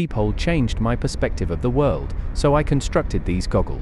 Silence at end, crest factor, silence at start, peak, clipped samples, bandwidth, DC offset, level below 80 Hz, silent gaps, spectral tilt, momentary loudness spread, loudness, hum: 0 s; 16 dB; 0 s; -4 dBFS; under 0.1%; 12 kHz; under 0.1%; -26 dBFS; none; -6.5 dB/octave; 5 LU; -22 LUFS; none